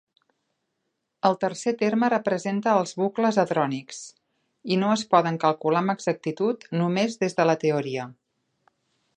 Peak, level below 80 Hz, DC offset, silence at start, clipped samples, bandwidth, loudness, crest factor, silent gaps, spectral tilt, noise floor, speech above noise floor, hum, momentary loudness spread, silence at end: -4 dBFS; -76 dBFS; under 0.1%; 1.25 s; under 0.1%; 10 kHz; -24 LUFS; 20 dB; none; -5.5 dB/octave; -78 dBFS; 55 dB; none; 10 LU; 1.05 s